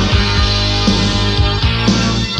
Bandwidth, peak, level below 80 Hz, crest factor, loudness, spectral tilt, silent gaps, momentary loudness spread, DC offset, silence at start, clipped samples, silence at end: 11 kHz; 0 dBFS; -20 dBFS; 12 dB; -13 LUFS; -5 dB/octave; none; 1 LU; under 0.1%; 0 s; under 0.1%; 0 s